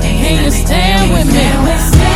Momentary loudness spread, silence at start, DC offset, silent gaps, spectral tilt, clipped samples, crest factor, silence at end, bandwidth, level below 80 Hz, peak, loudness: 2 LU; 0 s; under 0.1%; none; -5 dB/octave; 0.5%; 10 dB; 0 s; 16.5 kHz; -14 dBFS; 0 dBFS; -11 LUFS